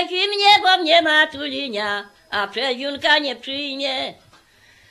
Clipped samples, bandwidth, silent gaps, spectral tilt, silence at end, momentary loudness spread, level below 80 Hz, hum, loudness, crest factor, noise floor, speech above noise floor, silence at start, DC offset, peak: under 0.1%; 13 kHz; none; -1.5 dB/octave; 0.8 s; 13 LU; -64 dBFS; none; -18 LUFS; 18 dB; -53 dBFS; 32 dB; 0 s; under 0.1%; -2 dBFS